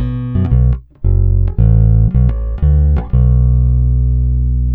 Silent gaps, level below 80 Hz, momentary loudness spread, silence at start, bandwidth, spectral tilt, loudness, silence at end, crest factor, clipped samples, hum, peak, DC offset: none; -14 dBFS; 5 LU; 0 s; 2.5 kHz; -13 dB/octave; -14 LUFS; 0 s; 10 dB; under 0.1%; 60 Hz at -30 dBFS; -2 dBFS; under 0.1%